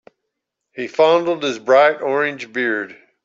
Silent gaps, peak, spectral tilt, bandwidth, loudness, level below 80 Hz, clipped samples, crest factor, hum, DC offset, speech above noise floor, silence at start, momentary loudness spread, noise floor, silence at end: none; -2 dBFS; -4.5 dB/octave; 7.6 kHz; -17 LUFS; -70 dBFS; under 0.1%; 16 dB; none; under 0.1%; 61 dB; 0.75 s; 15 LU; -78 dBFS; 0.3 s